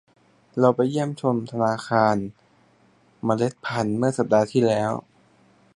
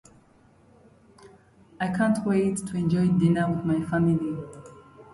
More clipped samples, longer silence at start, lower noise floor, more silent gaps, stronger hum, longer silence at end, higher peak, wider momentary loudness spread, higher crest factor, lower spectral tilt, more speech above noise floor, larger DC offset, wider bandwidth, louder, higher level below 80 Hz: neither; second, 0.55 s vs 1.25 s; about the same, -59 dBFS vs -58 dBFS; neither; neither; first, 0.75 s vs 0.1 s; first, -4 dBFS vs -10 dBFS; second, 8 LU vs 11 LU; about the same, 20 dB vs 16 dB; about the same, -7 dB/octave vs -7.5 dB/octave; about the same, 37 dB vs 34 dB; neither; about the same, 11.5 kHz vs 11.5 kHz; about the same, -23 LUFS vs -25 LUFS; second, -62 dBFS vs -56 dBFS